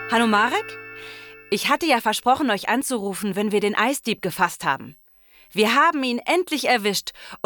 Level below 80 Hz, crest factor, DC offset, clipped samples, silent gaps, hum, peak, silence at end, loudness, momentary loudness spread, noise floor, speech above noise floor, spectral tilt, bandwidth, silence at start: -62 dBFS; 16 dB; under 0.1%; under 0.1%; none; none; -6 dBFS; 0.1 s; -21 LUFS; 14 LU; -53 dBFS; 32 dB; -3 dB/octave; over 20 kHz; 0 s